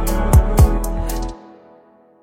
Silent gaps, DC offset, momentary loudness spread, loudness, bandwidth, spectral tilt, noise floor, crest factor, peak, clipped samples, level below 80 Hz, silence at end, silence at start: none; under 0.1%; 13 LU; -17 LUFS; 17 kHz; -6.5 dB/octave; -49 dBFS; 14 dB; -2 dBFS; under 0.1%; -18 dBFS; 0.85 s; 0 s